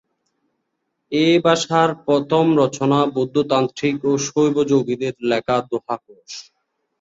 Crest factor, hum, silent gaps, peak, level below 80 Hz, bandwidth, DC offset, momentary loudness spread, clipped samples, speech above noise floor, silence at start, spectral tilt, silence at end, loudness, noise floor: 16 dB; none; none; -2 dBFS; -60 dBFS; 8 kHz; under 0.1%; 12 LU; under 0.1%; 56 dB; 1.1 s; -5.5 dB/octave; 0.6 s; -18 LUFS; -74 dBFS